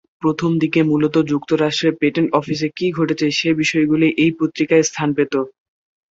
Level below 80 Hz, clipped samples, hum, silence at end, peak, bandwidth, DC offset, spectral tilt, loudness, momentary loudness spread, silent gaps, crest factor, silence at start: -58 dBFS; under 0.1%; none; 0.6 s; -2 dBFS; 7.8 kHz; under 0.1%; -5.5 dB/octave; -17 LUFS; 5 LU; none; 16 dB; 0.2 s